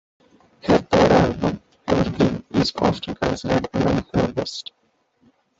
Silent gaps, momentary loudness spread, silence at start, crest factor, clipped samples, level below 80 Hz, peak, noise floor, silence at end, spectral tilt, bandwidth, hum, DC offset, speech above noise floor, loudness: none; 13 LU; 0.65 s; 18 dB; under 0.1%; -42 dBFS; -2 dBFS; -65 dBFS; 1 s; -6.5 dB/octave; 8 kHz; none; under 0.1%; 42 dB; -21 LUFS